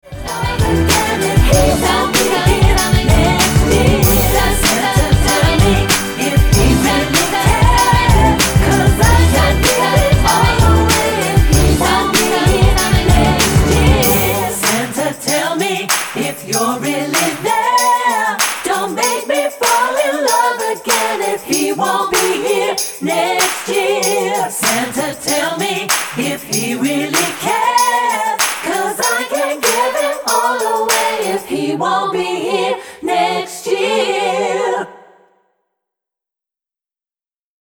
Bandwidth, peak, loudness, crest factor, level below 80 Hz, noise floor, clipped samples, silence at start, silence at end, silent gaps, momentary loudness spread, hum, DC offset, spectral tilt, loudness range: over 20 kHz; 0 dBFS; -13 LUFS; 14 dB; -22 dBFS; under -90 dBFS; under 0.1%; 0.05 s; 2.8 s; none; 6 LU; none; under 0.1%; -4 dB/octave; 5 LU